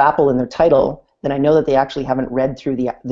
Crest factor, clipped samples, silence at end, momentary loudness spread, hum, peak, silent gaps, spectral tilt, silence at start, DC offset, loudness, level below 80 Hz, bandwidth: 16 dB; under 0.1%; 0 s; 8 LU; none; 0 dBFS; none; -7.5 dB/octave; 0 s; under 0.1%; -17 LUFS; -42 dBFS; 7.4 kHz